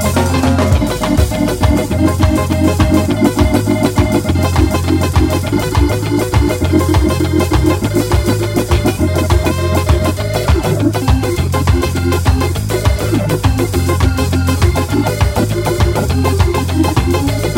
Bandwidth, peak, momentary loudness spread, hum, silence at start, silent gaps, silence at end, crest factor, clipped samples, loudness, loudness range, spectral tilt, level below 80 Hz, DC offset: 16.5 kHz; 0 dBFS; 2 LU; none; 0 s; none; 0 s; 12 dB; under 0.1%; -14 LUFS; 1 LU; -6 dB/octave; -20 dBFS; under 0.1%